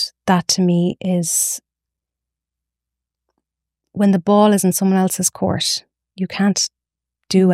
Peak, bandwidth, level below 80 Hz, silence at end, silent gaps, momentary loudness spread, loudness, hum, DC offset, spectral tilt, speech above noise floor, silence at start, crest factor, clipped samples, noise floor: -2 dBFS; 16 kHz; -58 dBFS; 0 s; none; 9 LU; -17 LUFS; none; under 0.1%; -4.5 dB/octave; 68 dB; 0 s; 18 dB; under 0.1%; -85 dBFS